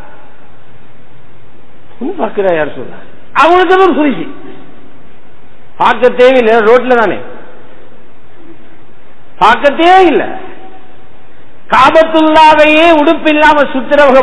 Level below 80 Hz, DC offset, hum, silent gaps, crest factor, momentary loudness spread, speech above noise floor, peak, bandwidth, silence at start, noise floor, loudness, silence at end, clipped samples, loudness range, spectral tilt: -40 dBFS; 10%; none; none; 10 dB; 16 LU; 34 dB; 0 dBFS; 11 kHz; 2 s; -41 dBFS; -7 LUFS; 0 s; 3%; 6 LU; -5 dB/octave